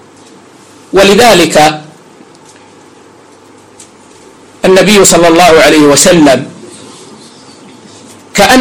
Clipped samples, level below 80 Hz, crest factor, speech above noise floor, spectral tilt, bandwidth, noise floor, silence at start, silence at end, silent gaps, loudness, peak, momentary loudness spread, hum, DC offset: 2%; -36 dBFS; 8 dB; 33 dB; -3.5 dB/octave; over 20 kHz; -37 dBFS; 0.95 s; 0 s; none; -5 LUFS; 0 dBFS; 10 LU; none; under 0.1%